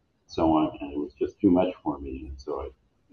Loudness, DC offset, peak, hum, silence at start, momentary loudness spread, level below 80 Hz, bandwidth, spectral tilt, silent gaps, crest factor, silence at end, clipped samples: -27 LUFS; under 0.1%; -10 dBFS; none; 0.3 s; 15 LU; -48 dBFS; 6.6 kHz; -8 dB/octave; none; 18 dB; 0.4 s; under 0.1%